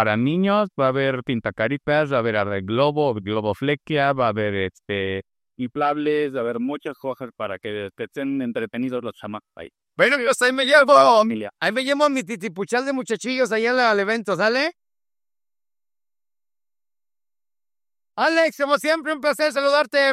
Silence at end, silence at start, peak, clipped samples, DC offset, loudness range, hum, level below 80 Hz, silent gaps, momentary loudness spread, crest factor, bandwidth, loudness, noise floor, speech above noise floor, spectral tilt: 0 s; 0 s; 0 dBFS; under 0.1%; under 0.1%; 9 LU; none; -64 dBFS; none; 12 LU; 20 dB; 14.5 kHz; -21 LUFS; under -90 dBFS; over 69 dB; -5 dB/octave